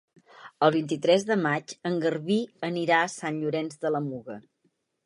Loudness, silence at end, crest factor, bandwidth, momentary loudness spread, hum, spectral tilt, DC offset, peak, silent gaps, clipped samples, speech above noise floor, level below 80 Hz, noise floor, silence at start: -26 LUFS; 0.65 s; 20 dB; 11.5 kHz; 8 LU; none; -5.5 dB/octave; under 0.1%; -6 dBFS; none; under 0.1%; 46 dB; -76 dBFS; -73 dBFS; 0.4 s